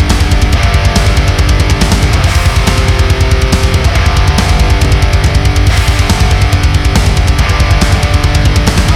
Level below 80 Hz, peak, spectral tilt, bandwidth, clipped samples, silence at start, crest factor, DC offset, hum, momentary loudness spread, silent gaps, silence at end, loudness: -10 dBFS; 0 dBFS; -5 dB/octave; 15.5 kHz; under 0.1%; 0 s; 8 dB; under 0.1%; none; 1 LU; none; 0 s; -10 LUFS